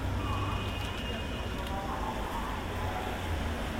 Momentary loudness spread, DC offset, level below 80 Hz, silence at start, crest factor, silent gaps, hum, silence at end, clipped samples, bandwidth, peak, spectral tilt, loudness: 3 LU; under 0.1%; -40 dBFS; 0 s; 12 dB; none; none; 0 s; under 0.1%; 16 kHz; -22 dBFS; -5.5 dB/octave; -35 LUFS